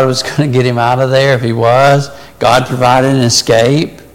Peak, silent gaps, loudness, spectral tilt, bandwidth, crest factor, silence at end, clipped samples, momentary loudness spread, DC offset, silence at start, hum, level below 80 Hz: 0 dBFS; none; -10 LUFS; -5 dB/octave; 16.5 kHz; 10 dB; 0.15 s; under 0.1%; 5 LU; under 0.1%; 0 s; none; -42 dBFS